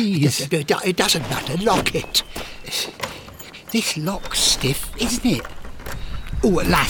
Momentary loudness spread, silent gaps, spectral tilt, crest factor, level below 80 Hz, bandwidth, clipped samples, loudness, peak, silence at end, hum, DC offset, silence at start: 16 LU; none; -3.5 dB/octave; 20 dB; -34 dBFS; over 20 kHz; under 0.1%; -20 LUFS; -2 dBFS; 0 s; none; under 0.1%; 0 s